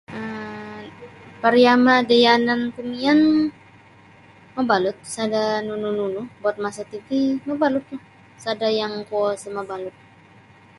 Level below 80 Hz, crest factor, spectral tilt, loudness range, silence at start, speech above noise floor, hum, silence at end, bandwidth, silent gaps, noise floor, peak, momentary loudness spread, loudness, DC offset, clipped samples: -62 dBFS; 20 dB; -4.5 dB/octave; 7 LU; 0.1 s; 30 dB; none; 0.9 s; 11.5 kHz; none; -49 dBFS; -2 dBFS; 19 LU; -20 LUFS; under 0.1%; under 0.1%